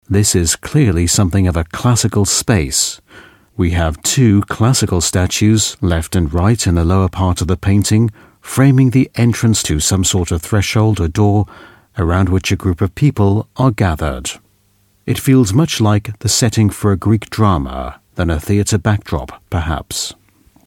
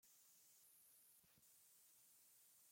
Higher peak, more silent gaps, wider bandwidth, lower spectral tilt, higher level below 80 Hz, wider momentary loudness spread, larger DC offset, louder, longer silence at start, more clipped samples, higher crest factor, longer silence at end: first, 0 dBFS vs -58 dBFS; neither; about the same, 16.5 kHz vs 16.5 kHz; first, -5 dB/octave vs 0 dB/octave; first, -30 dBFS vs under -90 dBFS; first, 9 LU vs 1 LU; neither; first, -14 LUFS vs -69 LUFS; about the same, 0.1 s vs 0 s; neither; about the same, 14 dB vs 14 dB; first, 0.55 s vs 0 s